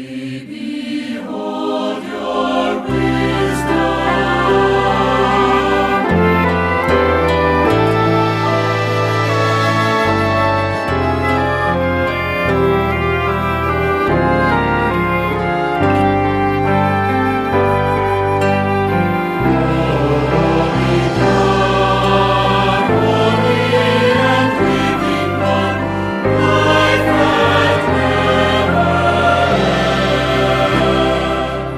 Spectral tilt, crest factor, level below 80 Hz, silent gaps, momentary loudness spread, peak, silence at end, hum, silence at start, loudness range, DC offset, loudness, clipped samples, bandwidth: -6.5 dB/octave; 14 dB; -32 dBFS; none; 4 LU; 0 dBFS; 0 s; none; 0 s; 2 LU; under 0.1%; -14 LUFS; under 0.1%; 15.5 kHz